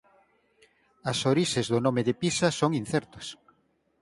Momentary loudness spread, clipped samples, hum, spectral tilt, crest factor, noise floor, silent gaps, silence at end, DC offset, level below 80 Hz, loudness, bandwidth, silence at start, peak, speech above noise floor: 14 LU; under 0.1%; none; -5 dB/octave; 20 dB; -70 dBFS; none; 0.65 s; under 0.1%; -62 dBFS; -27 LUFS; 11.5 kHz; 1.05 s; -8 dBFS; 43 dB